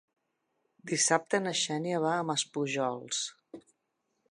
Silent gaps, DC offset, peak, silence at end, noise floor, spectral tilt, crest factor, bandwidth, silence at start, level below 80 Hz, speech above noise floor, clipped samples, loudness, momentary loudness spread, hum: none; under 0.1%; -10 dBFS; 0.7 s; -80 dBFS; -2.5 dB/octave; 24 dB; 11 kHz; 0.85 s; -84 dBFS; 50 dB; under 0.1%; -30 LUFS; 8 LU; none